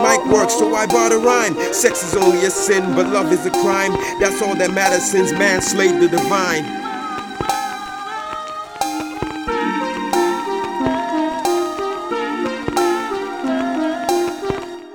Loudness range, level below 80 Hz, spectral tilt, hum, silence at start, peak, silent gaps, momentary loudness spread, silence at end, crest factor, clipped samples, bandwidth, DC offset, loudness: 7 LU; -48 dBFS; -3.5 dB/octave; none; 0 s; 0 dBFS; none; 11 LU; 0 s; 18 dB; under 0.1%; 17.5 kHz; 0.1%; -18 LUFS